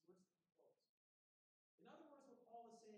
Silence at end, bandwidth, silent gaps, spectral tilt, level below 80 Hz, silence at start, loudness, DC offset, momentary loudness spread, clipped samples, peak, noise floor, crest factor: 0 s; 9.4 kHz; 0.89-1.78 s; -5 dB/octave; under -90 dBFS; 0.05 s; -66 LUFS; under 0.1%; 6 LU; under 0.1%; -50 dBFS; under -90 dBFS; 18 dB